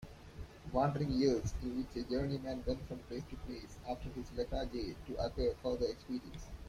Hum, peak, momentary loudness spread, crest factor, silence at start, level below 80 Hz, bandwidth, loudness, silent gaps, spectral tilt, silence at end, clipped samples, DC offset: none; -20 dBFS; 14 LU; 20 dB; 0 s; -50 dBFS; 15 kHz; -39 LUFS; none; -6.5 dB/octave; 0 s; under 0.1%; under 0.1%